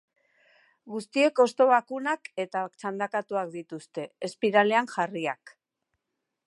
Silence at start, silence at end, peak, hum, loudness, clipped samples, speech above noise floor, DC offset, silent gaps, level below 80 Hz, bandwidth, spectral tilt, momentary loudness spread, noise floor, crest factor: 0.85 s; 0.95 s; -6 dBFS; none; -27 LUFS; under 0.1%; 57 dB; under 0.1%; none; -82 dBFS; 11.5 kHz; -4.5 dB/octave; 16 LU; -84 dBFS; 22 dB